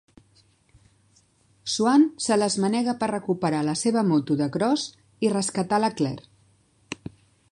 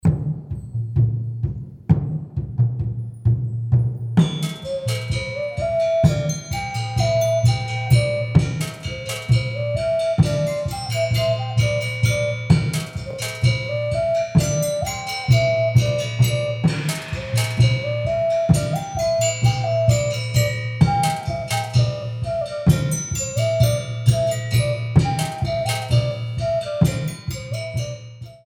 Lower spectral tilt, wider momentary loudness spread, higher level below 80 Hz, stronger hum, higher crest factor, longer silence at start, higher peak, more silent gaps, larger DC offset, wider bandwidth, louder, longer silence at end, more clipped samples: about the same, -5 dB/octave vs -5.5 dB/octave; first, 17 LU vs 9 LU; second, -64 dBFS vs -38 dBFS; neither; about the same, 16 dB vs 18 dB; first, 1.65 s vs 0.05 s; second, -8 dBFS vs -2 dBFS; neither; neither; second, 11.5 kHz vs 17 kHz; second, -24 LUFS vs -21 LUFS; first, 0.55 s vs 0.1 s; neither